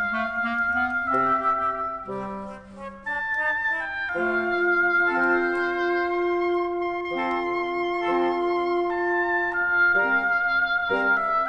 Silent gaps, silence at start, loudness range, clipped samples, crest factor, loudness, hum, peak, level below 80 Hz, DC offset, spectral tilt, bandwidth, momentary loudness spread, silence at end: none; 0 s; 3 LU; under 0.1%; 14 dB; -23 LUFS; 50 Hz at -60 dBFS; -10 dBFS; -56 dBFS; under 0.1%; -6 dB/octave; 6.6 kHz; 9 LU; 0 s